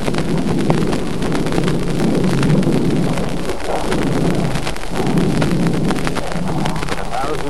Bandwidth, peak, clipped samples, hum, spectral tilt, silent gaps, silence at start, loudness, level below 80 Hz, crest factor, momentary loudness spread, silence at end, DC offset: 13 kHz; 0 dBFS; under 0.1%; none; -6.5 dB/octave; none; 0 s; -18 LUFS; -30 dBFS; 18 dB; 6 LU; 0 s; 10%